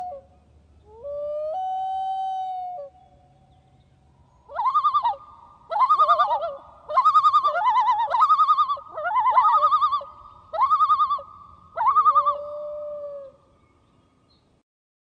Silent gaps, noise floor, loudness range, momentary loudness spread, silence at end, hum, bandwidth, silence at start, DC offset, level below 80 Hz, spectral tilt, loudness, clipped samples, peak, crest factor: none; -62 dBFS; 12 LU; 18 LU; 1.9 s; none; 8 kHz; 0 s; under 0.1%; -64 dBFS; -3 dB/octave; -21 LUFS; under 0.1%; -8 dBFS; 16 dB